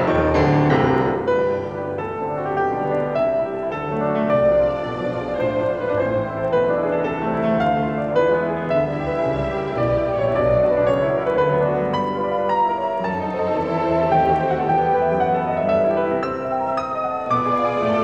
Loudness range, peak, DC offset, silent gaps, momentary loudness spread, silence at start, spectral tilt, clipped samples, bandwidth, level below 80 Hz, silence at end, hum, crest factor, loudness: 2 LU; -4 dBFS; 0.2%; none; 6 LU; 0 s; -8 dB/octave; under 0.1%; 8 kHz; -42 dBFS; 0 s; none; 14 dB; -20 LUFS